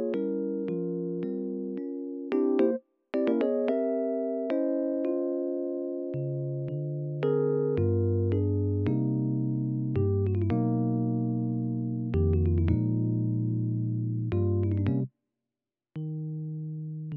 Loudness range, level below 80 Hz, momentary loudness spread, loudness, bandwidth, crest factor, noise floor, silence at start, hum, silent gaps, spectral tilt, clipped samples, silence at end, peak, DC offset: 3 LU; -50 dBFS; 8 LU; -29 LUFS; 4.3 kHz; 16 dB; -90 dBFS; 0 s; none; none; -10.5 dB/octave; under 0.1%; 0 s; -12 dBFS; under 0.1%